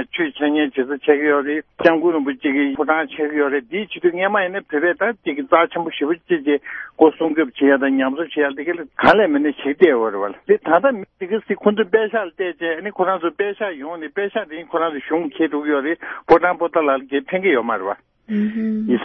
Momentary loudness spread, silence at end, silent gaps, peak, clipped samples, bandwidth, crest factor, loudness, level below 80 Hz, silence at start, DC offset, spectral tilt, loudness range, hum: 10 LU; 0 s; none; 0 dBFS; under 0.1%; 6 kHz; 18 dB; -19 LUFS; -58 dBFS; 0 s; under 0.1%; -7.5 dB/octave; 5 LU; none